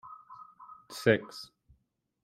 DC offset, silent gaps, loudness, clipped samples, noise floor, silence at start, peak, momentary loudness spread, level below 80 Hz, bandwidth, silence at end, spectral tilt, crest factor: under 0.1%; none; -29 LUFS; under 0.1%; -75 dBFS; 0.05 s; -8 dBFS; 24 LU; -70 dBFS; 16 kHz; 0.8 s; -5.5 dB/octave; 26 dB